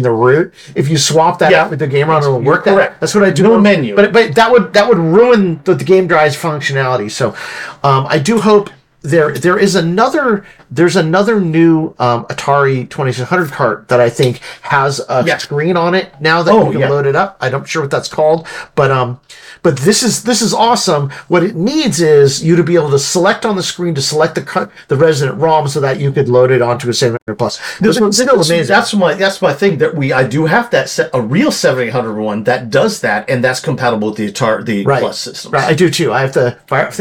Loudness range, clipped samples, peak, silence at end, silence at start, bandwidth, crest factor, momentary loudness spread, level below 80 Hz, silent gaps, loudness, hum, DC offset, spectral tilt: 4 LU; under 0.1%; 0 dBFS; 0 s; 0 s; 18 kHz; 12 dB; 8 LU; -50 dBFS; 27.22-27.26 s; -12 LUFS; none; under 0.1%; -5 dB/octave